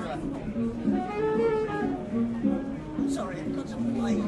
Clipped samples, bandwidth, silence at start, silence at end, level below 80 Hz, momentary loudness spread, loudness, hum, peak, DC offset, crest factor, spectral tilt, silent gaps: under 0.1%; 11.5 kHz; 0 s; 0 s; -48 dBFS; 7 LU; -29 LUFS; none; -14 dBFS; under 0.1%; 14 dB; -7 dB/octave; none